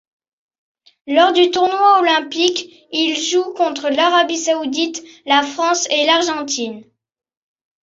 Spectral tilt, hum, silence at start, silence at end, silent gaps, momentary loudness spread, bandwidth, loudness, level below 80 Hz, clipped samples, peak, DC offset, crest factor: -1 dB/octave; none; 1.05 s; 1 s; none; 10 LU; 7.8 kHz; -16 LUFS; -68 dBFS; under 0.1%; 0 dBFS; under 0.1%; 16 dB